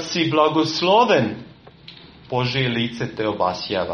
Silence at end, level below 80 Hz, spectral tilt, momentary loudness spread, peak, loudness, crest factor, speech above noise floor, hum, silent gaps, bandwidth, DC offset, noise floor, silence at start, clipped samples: 0 s; -56 dBFS; -5 dB/octave; 10 LU; -4 dBFS; -20 LUFS; 18 dB; 24 dB; none; none; 9 kHz; under 0.1%; -44 dBFS; 0 s; under 0.1%